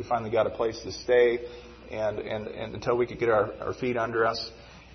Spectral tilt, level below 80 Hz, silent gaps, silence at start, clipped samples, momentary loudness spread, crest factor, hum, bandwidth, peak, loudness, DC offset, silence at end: -5.5 dB/octave; -54 dBFS; none; 0 s; under 0.1%; 13 LU; 18 dB; none; 6.4 kHz; -10 dBFS; -27 LUFS; under 0.1%; 0 s